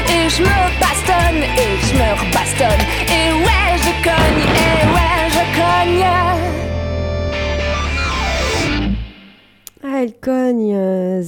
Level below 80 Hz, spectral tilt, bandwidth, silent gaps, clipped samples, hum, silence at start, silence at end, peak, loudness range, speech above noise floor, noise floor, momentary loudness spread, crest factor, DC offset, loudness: -24 dBFS; -4.5 dB/octave; 19 kHz; none; under 0.1%; none; 0 s; 0 s; -4 dBFS; 6 LU; 28 dB; -44 dBFS; 8 LU; 10 dB; under 0.1%; -15 LUFS